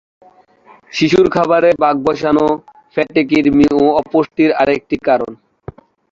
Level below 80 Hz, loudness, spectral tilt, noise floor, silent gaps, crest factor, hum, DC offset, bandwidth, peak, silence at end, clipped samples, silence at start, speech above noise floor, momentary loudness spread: -46 dBFS; -14 LUFS; -6.5 dB/octave; -46 dBFS; none; 14 dB; none; under 0.1%; 7.6 kHz; 0 dBFS; 0.8 s; under 0.1%; 0.95 s; 33 dB; 10 LU